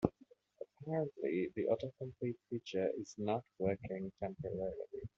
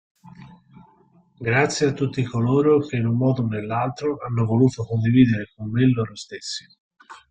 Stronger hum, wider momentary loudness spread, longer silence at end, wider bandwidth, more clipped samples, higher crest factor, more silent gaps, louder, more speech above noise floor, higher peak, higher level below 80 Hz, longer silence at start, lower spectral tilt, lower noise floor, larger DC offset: neither; second, 8 LU vs 13 LU; about the same, 0.1 s vs 0.15 s; second, 7.4 kHz vs 9.2 kHz; neither; first, 26 dB vs 18 dB; second, none vs 6.80-6.91 s; second, -40 LUFS vs -21 LUFS; second, 28 dB vs 36 dB; second, -14 dBFS vs -4 dBFS; second, -66 dBFS vs -54 dBFS; second, 0 s vs 0.25 s; about the same, -7 dB/octave vs -7 dB/octave; first, -67 dBFS vs -57 dBFS; neither